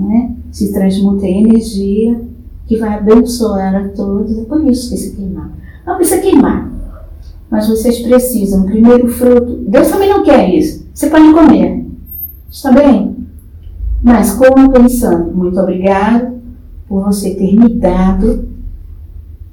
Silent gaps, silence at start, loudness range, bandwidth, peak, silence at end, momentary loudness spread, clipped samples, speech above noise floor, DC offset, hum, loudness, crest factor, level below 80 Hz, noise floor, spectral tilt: none; 0 s; 5 LU; 19.5 kHz; 0 dBFS; 0.05 s; 17 LU; 2%; 21 dB; under 0.1%; none; -10 LUFS; 10 dB; -26 dBFS; -30 dBFS; -6.5 dB/octave